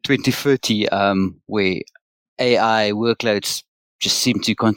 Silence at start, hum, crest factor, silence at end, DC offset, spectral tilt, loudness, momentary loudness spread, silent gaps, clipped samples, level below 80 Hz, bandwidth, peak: 0.05 s; none; 16 dB; 0 s; under 0.1%; -4 dB/octave; -19 LUFS; 7 LU; 2.01-2.36 s, 3.68-3.99 s; under 0.1%; -58 dBFS; 17 kHz; -4 dBFS